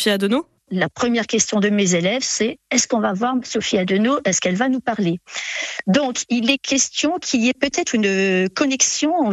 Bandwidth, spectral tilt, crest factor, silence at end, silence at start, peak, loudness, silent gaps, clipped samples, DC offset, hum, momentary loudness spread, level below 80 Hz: 13 kHz; -3.5 dB/octave; 18 dB; 0 s; 0 s; -2 dBFS; -19 LUFS; none; under 0.1%; under 0.1%; none; 6 LU; -60 dBFS